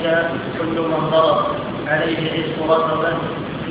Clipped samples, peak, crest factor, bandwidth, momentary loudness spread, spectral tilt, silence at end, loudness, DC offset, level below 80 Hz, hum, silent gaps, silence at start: under 0.1%; -2 dBFS; 16 dB; 5.2 kHz; 8 LU; -9 dB/octave; 0 s; -19 LUFS; under 0.1%; -48 dBFS; none; none; 0 s